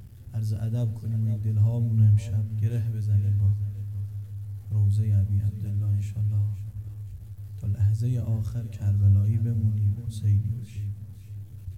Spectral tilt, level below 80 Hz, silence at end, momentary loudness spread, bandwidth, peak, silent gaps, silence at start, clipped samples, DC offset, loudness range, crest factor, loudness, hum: -9 dB/octave; -50 dBFS; 0 s; 16 LU; 3.9 kHz; -12 dBFS; none; 0 s; under 0.1%; 0.2%; 3 LU; 14 dB; -26 LUFS; none